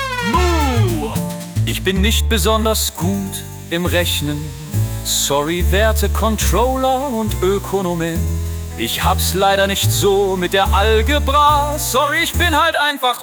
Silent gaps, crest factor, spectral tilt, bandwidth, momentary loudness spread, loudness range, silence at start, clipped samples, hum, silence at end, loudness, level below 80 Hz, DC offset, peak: none; 14 dB; -4 dB/octave; over 20 kHz; 8 LU; 3 LU; 0 s; under 0.1%; none; 0 s; -16 LUFS; -24 dBFS; under 0.1%; -2 dBFS